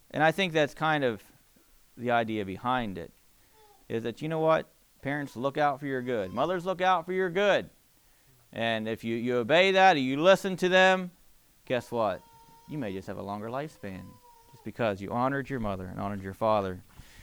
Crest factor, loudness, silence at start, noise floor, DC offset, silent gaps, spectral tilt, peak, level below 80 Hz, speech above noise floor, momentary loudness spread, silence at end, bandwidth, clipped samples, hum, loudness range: 20 dB; -28 LUFS; 0.15 s; -62 dBFS; under 0.1%; none; -5.5 dB/octave; -10 dBFS; -58 dBFS; 35 dB; 17 LU; 0 s; over 20 kHz; under 0.1%; none; 10 LU